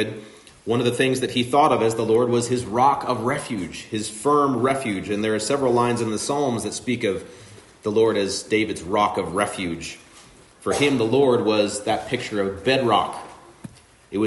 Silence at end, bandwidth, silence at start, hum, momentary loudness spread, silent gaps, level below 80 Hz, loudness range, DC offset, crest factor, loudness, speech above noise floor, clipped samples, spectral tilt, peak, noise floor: 0 s; 11.5 kHz; 0 s; none; 12 LU; none; -58 dBFS; 3 LU; under 0.1%; 18 dB; -22 LUFS; 27 dB; under 0.1%; -4.5 dB/octave; -4 dBFS; -49 dBFS